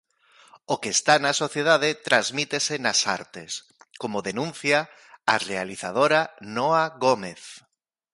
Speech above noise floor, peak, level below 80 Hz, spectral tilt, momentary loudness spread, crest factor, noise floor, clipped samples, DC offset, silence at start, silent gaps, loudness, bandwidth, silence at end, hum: 33 dB; -4 dBFS; -70 dBFS; -2.5 dB/octave; 14 LU; 20 dB; -57 dBFS; under 0.1%; under 0.1%; 0.7 s; none; -23 LUFS; 11.5 kHz; 0.55 s; none